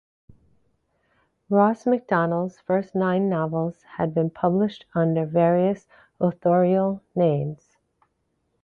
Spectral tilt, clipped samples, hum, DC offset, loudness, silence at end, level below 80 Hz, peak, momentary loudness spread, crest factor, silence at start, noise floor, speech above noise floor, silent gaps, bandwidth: -9.5 dB/octave; under 0.1%; none; under 0.1%; -23 LUFS; 1.1 s; -62 dBFS; -6 dBFS; 8 LU; 18 dB; 1.5 s; -72 dBFS; 50 dB; none; 6.8 kHz